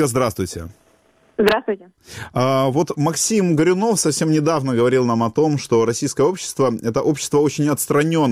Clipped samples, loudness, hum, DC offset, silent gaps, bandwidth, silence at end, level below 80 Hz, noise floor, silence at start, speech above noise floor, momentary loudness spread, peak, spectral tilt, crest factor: under 0.1%; -18 LUFS; none; under 0.1%; none; 16 kHz; 0 s; -52 dBFS; -56 dBFS; 0 s; 38 dB; 10 LU; -2 dBFS; -5 dB/octave; 16 dB